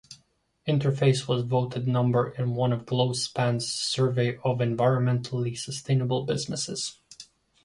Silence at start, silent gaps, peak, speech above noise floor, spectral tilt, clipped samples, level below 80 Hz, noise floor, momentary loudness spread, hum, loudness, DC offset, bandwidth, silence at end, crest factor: 0.1 s; none; -10 dBFS; 42 dB; -5.5 dB/octave; under 0.1%; -60 dBFS; -67 dBFS; 8 LU; none; -26 LUFS; under 0.1%; 11.5 kHz; 0.4 s; 18 dB